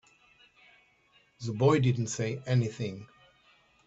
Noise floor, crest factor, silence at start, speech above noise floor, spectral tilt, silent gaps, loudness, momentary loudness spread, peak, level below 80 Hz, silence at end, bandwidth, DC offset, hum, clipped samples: -66 dBFS; 20 dB; 1.4 s; 38 dB; -6.5 dB/octave; none; -29 LUFS; 14 LU; -12 dBFS; -66 dBFS; 0.8 s; 8 kHz; under 0.1%; none; under 0.1%